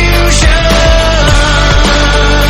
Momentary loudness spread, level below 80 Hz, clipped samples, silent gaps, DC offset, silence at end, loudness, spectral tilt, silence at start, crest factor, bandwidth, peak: 1 LU; -10 dBFS; 2%; none; under 0.1%; 0 s; -8 LUFS; -4 dB/octave; 0 s; 6 dB; 15 kHz; 0 dBFS